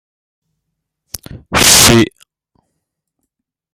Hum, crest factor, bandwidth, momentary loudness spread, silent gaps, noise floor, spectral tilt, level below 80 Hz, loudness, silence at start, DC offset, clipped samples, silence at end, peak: none; 16 dB; over 20 kHz; 25 LU; none; -75 dBFS; -2 dB/octave; -36 dBFS; -8 LUFS; 1.35 s; under 0.1%; 0.2%; 1.7 s; 0 dBFS